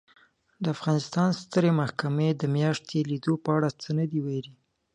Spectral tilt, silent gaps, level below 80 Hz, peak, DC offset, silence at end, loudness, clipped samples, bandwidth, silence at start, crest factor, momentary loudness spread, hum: -7 dB/octave; none; -68 dBFS; -10 dBFS; under 0.1%; 0.45 s; -27 LUFS; under 0.1%; 9.8 kHz; 0.6 s; 16 dB; 7 LU; none